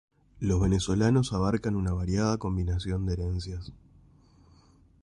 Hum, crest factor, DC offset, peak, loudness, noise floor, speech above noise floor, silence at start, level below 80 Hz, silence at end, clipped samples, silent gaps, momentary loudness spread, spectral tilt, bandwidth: none; 16 dB; under 0.1%; -14 dBFS; -28 LUFS; -59 dBFS; 32 dB; 0.35 s; -38 dBFS; 1.25 s; under 0.1%; none; 10 LU; -6.5 dB/octave; 11 kHz